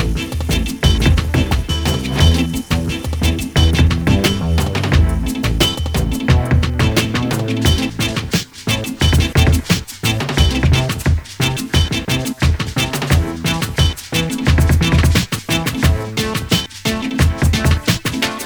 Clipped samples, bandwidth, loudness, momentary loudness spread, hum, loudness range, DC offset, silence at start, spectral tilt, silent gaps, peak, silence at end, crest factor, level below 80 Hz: under 0.1%; over 20 kHz; -16 LUFS; 6 LU; none; 1 LU; under 0.1%; 0 s; -5 dB/octave; none; 0 dBFS; 0 s; 16 dB; -22 dBFS